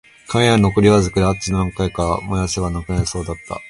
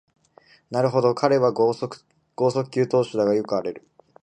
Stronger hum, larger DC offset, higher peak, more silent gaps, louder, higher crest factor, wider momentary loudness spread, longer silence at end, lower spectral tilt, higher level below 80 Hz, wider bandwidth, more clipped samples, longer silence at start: neither; neither; first, 0 dBFS vs -4 dBFS; neither; first, -18 LUFS vs -22 LUFS; about the same, 16 dB vs 20 dB; second, 9 LU vs 13 LU; second, 0 s vs 0.45 s; second, -5.5 dB/octave vs -7 dB/octave; first, -32 dBFS vs -68 dBFS; first, 11.5 kHz vs 10 kHz; neither; second, 0.3 s vs 0.7 s